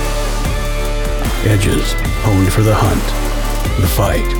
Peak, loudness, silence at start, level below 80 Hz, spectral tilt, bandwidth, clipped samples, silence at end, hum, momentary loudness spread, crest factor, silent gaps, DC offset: -2 dBFS; -16 LUFS; 0 s; -18 dBFS; -5.5 dB/octave; 19 kHz; under 0.1%; 0 s; none; 7 LU; 12 dB; none; under 0.1%